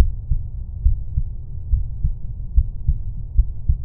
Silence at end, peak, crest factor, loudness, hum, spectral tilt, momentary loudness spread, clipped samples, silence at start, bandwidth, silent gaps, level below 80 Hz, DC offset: 0 s; -2 dBFS; 18 dB; -26 LUFS; none; -17.5 dB/octave; 8 LU; under 0.1%; 0 s; 1 kHz; none; -22 dBFS; under 0.1%